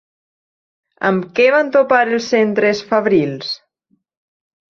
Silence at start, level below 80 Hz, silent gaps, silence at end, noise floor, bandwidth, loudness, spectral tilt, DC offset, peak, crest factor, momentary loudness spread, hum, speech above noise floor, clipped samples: 1 s; -62 dBFS; none; 1.15 s; -64 dBFS; 7.4 kHz; -15 LUFS; -5.5 dB/octave; under 0.1%; 0 dBFS; 16 dB; 9 LU; none; 50 dB; under 0.1%